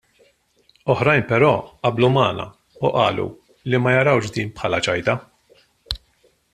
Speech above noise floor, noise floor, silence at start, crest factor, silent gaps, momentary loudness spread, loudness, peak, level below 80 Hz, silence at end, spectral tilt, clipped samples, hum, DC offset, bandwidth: 42 dB; -61 dBFS; 0.85 s; 18 dB; none; 14 LU; -20 LUFS; -2 dBFS; -48 dBFS; 0.55 s; -6 dB/octave; under 0.1%; none; under 0.1%; 11.5 kHz